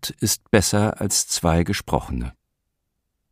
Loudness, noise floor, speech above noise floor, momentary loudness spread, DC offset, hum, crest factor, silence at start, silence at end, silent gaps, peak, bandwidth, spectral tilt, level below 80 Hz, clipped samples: -21 LUFS; -76 dBFS; 55 dB; 11 LU; under 0.1%; none; 22 dB; 0 s; 1 s; none; -2 dBFS; 15.5 kHz; -4 dB/octave; -38 dBFS; under 0.1%